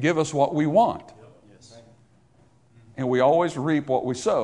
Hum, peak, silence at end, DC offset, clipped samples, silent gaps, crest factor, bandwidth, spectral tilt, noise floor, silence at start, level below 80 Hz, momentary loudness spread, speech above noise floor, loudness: none; -8 dBFS; 0 s; under 0.1%; under 0.1%; none; 16 dB; 11 kHz; -6 dB/octave; -59 dBFS; 0 s; -62 dBFS; 9 LU; 37 dB; -22 LUFS